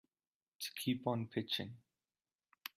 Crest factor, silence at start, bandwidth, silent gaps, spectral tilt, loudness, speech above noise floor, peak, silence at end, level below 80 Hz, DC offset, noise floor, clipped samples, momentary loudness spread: 20 dB; 0.6 s; 16 kHz; none; -5 dB/octave; -41 LUFS; over 50 dB; -22 dBFS; 0.1 s; -80 dBFS; under 0.1%; under -90 dBFS; under 0.1%; 11 LU